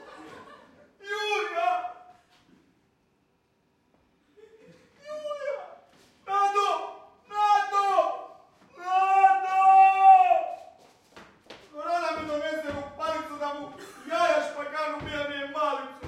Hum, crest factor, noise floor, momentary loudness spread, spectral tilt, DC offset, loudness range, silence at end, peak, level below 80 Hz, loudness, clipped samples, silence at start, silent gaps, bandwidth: none; 20 dB; -69 dBFS; 22 LU; -3 dB/octave; under 0.1%; 15 LU; 0 s; -8 dBFS; -66 dBFS; -25 LUFS; under 0.1%; 0 s; none; 11 kHz